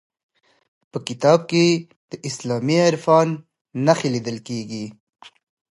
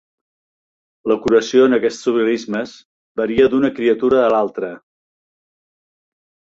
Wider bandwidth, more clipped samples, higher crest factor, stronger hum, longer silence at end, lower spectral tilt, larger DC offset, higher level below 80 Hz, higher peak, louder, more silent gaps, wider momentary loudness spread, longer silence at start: first, 11.5 kHz vs 8 kHz; neither; about the same, 20 dB vs 16 dB; neither; second, 0.8 s vs 1.7 s; about the same, -5.5 dB/octave vs -5.5 dB/octave; neither; second, -68 dBFS vs -54 dBFS; about the same, -2 dBFS vs -2 dBFS; second, -20 LUFS vs -16 LUFS; second, 1.96-2.08 s, 3.61-3.65 s vs 2.85-3.15 s; about the same, 16 LU vs 14 LU; about the same, 0.95 s vs 1.05 s